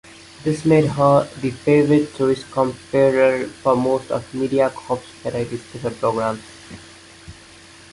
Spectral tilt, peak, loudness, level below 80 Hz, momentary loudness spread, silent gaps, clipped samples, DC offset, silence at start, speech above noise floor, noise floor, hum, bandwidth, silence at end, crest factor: -7 dB/octave; -2 dBFS; -19 LUFS; -52 dBFS; 13 LU; none; under 0.1%; under 0.1%; 0.4 s; 25 dB; -44 dBFS; none; 11.5 kHz; 0.6 s; 18 dB